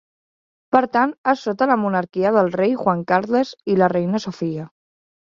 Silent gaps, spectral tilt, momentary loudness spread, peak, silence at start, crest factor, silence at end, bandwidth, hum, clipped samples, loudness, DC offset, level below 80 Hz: 1.18-1.24 s; -7 dB/octave; 8 LU; -2 dBFS; 0.7 s; 18 dB; 0.75 s; 7.4 kHz; none; under 0.1%; -19 LUFS; under 0.1%; -64 dBFS